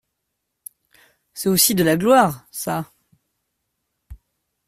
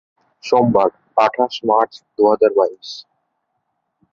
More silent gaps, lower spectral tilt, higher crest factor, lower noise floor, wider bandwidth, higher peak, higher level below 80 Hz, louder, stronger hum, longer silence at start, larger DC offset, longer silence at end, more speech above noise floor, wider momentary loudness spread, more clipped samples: neither; second, -4 dB/octave vs -6 dB/octave; about the same, 20 dB vs 16 dB; first, -77 dBFS vs -72 dBFS; first, 16 kHz vs 7.4 kHz; about the same, -2 dBFS vs -2 dBFS; first, -54 dBFS vs -60 dBFS; about the same, -18 LUFS vs -16 LUFS; neither; first, 1.35 s vs 0.45 s; neither; second, 0.5 s vs 1.1 s; about the same, 59 dB vs 56 dB; about the same, 16 LU vs 18 LU; neither